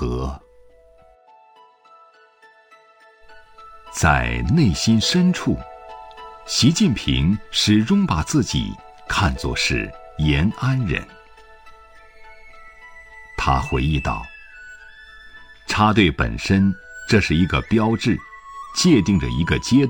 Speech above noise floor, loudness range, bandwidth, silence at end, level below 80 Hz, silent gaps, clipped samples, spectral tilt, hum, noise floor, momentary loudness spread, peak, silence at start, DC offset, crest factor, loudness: 34 dB; 7 LU; 17 kHz; 0 s; -34 dBFS; none; under 0.1%; -5 dB/octave; none; -52 dBFS; 22 LU; -2 dBFS; 0 s; under 0.1%; 18 dB; -19 LUFS